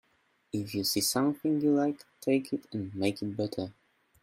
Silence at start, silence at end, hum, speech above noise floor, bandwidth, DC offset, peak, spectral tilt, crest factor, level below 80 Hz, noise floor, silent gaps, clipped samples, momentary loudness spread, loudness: 0.55 s; 0.5 s; none; 41 dB; 16 kHz; under 0.1%; -14 dBFS; -4.5 dB/octave; 18 dB; -70 dBFS; -71 dBFS; none; under 0.1%; 11 LU; -31 LUFS